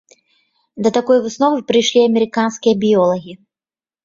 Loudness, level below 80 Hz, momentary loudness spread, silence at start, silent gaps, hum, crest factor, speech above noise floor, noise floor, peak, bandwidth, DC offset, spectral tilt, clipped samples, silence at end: -15 LUFS; -60 dBFS; 4 LU; 0.75 s; none; none; 14 dB; over 75 dB; under -90 dBFS; -2 dBFS; 7.6 kHz; under 0.1%; -4.5 dB/octave; under 0.1%; 0.7 s